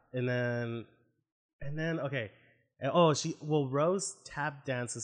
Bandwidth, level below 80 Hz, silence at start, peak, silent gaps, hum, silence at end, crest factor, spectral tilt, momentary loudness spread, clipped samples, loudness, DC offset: 11 kHz; -66 dBFS; 0.15 s; -14 dBFS; 1.32-1.59 s; none; 0 s; 18 dB; -5 dB/octave; 13 LU; under 0.1%; -33 LUFS; under 0.1%